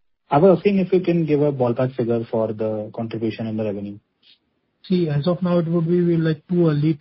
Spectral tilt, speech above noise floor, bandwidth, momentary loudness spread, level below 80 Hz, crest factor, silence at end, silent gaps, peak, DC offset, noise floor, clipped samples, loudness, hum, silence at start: -13 dB/octave; 49 dB; 5.8 kHz; 9 LU; -58 dBFS; 18 dB; 0.05 s; none; -2 dBFS; under 0.1%; -68 dBFS; under 0.1%; -20 LUFS; none; 0.3 s